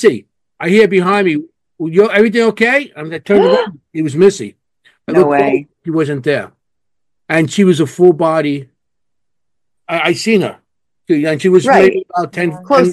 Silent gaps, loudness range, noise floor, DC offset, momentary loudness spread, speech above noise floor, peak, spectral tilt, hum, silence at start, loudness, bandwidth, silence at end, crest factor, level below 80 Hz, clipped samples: none; 3 LU; -80 dBFS; under 0.1%; 12 LU; 68 dB; 0 dBFS; -6 dB/octave; none; 0 s; -13 LUFS; 12.5 kHz; 0 s; 14 dB; -58 dBFS; 0.5%